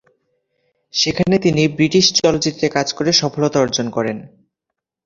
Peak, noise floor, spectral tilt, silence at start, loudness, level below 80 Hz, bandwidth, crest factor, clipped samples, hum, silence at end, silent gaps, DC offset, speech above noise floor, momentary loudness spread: 0 dBFS; -81 dBFS; -4 dB/octave; 0.95 s; -16 LUFS; -50 dBFS; 7.6 kHz; 18 dB; under 0.1%; none; 0.8 s; none; under 0.1%; 65 dB; 9 LU